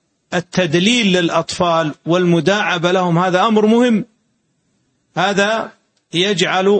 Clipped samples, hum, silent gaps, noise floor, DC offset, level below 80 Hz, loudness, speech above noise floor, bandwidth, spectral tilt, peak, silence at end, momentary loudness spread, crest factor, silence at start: under 0.1%; none; none; -64 dBFS; under 0.1%; -56 dBFS; -15 LUFS; 50 dB; 8.8 kHz; -5 dB/octave; -2 dBFS; 0 s; 10 LU; 14 dB; 0.3 s